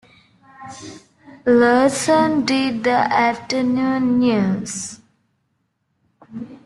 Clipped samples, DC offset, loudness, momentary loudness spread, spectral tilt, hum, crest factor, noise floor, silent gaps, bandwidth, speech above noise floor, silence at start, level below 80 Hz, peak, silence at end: under 0.1%; under 0.1%; -17 LUFS; 21 LU; -4.5 dB/octave; none; 18 dB; -70 dBFS; none; 12 kHz; 52 dB; 0.6 s; -60 dBFS; -2 dBFS; 0.1 s